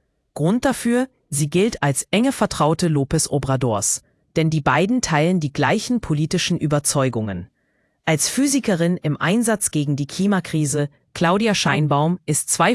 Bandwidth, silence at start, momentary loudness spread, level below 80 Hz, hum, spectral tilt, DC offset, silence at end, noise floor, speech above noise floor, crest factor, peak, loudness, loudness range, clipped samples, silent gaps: 12 kHz; 0.35 s; 6 LU; -48 dBFS; none; -4.5 dB/octave; under 0.1%; 0 s; -66 dBFS; 47 dB; 18 dB; -2 dBFS; -20 LUFS; 1 LU; under 0.1%; none